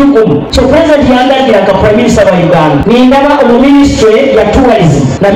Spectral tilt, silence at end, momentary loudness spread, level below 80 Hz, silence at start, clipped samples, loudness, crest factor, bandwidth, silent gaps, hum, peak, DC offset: -6 dB/octave; 0 s; 2 LU; -22 dBFS; 0 s; under 0.1%; -5 LUFS; 4 dB; 13 kHz; none; none; 0 dBFS; under 0.1%